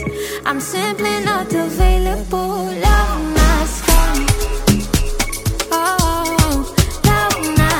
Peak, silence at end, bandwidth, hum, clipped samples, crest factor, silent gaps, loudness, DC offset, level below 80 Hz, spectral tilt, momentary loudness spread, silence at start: 0 dBFS; 0 s; 18.5 kHz; none; under 0.1%; 16 dB; none; -17 LUFS; under 0.1%; -20 dBFS; -4.5 dB/octave; 6 LU; 0 s